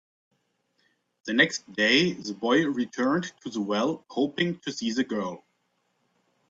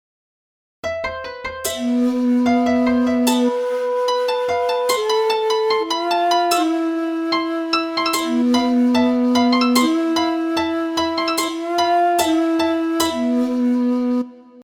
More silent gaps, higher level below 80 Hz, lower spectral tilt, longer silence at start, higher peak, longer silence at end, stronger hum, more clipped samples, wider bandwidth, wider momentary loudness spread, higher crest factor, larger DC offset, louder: neither; second, -70 dBFS vs -54 dBFS; about the same, -4 dB/octave vs -3 dB/octave; first, 1.25 s vs 0.85 s; second, -8 dBFS vs -4 dBFS; first, 1.1 s vs 0 s; neither; neither; second, 7.8 kHz vs 18 kHz; first, 11 LU vs 6 LU; first, 22 dB vs 16 dB; neither; second, -26 LUFS vs -18 LUFS